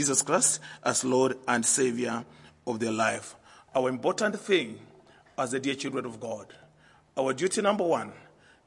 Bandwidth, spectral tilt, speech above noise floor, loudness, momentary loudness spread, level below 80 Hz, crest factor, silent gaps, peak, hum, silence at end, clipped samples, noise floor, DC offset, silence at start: 11.5 kHz; -3 dB/octave; 32 dB; -28 LUFS; 15 LU; -72 dBFS; 22 dB; none; -8 dBFS; none; 0.45 s; under 0.1%; -60 dBFS; under 0.1%; 0 s